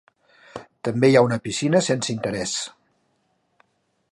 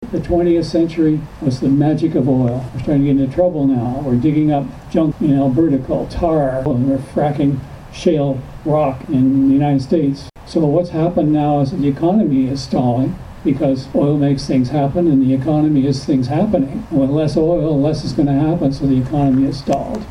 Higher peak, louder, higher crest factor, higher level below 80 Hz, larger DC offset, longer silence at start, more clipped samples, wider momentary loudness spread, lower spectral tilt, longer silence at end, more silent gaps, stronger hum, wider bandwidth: about the same, -2 dBFS vs -2 dBFS; second, -21 LUFS vs -16 LUFS; first, 20 dB vs 14 dB; second, -60 dBFS vs -36 dBFS; neither; first, 0.55 s vs 0 s; neither; first, 22 LU vs 5 LU; second, -5 dB/octave vs -8.5 dB/octave; first, 1.45 s vs 0 s; neither; neither; about the same, 11.5 kHz vs 10.5 kHz